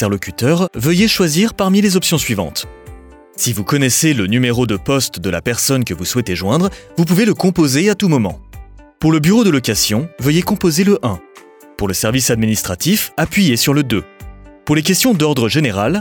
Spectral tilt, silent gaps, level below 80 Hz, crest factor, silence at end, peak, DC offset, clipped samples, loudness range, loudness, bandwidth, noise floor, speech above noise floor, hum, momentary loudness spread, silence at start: -4.5 dB/octave; none; -40 dBFS; 12 dB; 0 s; -2 dBFS; under 0.1%; under 0.1%; 1 LU; -15 LUFS; over 20 kHz; -41 dBFS; 27 dB; none; 7 LU; 0 s